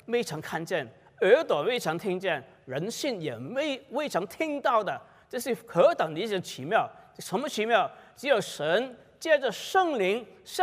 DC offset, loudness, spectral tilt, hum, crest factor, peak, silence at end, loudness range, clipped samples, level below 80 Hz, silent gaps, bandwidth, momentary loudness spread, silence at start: under 0.1%; -28 LUFS; -4 dB/octave; none; 20 dB; -8 dBFS; 0 s; 3 LU; under 0.1%; -74 dBFS; none; 16 kHz; 12 LU; 0.1 s